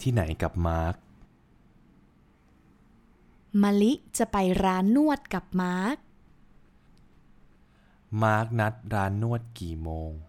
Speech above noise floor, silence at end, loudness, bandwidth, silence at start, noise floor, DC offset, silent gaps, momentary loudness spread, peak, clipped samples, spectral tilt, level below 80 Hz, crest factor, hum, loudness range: 34 dB; 0.05 s; -27 LUFS; 16 kHz; 0 s; -60 dBFS; under 0.1%; none; 12 LU; -10 dBFS; under 0.1%; -6.5 dB/octave; -44 dBFS; 18 dB; none; 8 LU